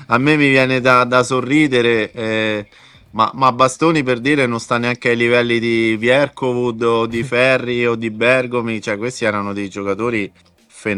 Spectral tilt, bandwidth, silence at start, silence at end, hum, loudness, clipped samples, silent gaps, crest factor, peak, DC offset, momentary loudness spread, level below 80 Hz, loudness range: -5.5 dB/octave; 11.5 kHz; 0 s; 0 s; none; -16 LUFS; under 0.1%; none; 16 dB; 0 dBFS; under 0.1%; 9 LU; -54 dBFS; 2 LU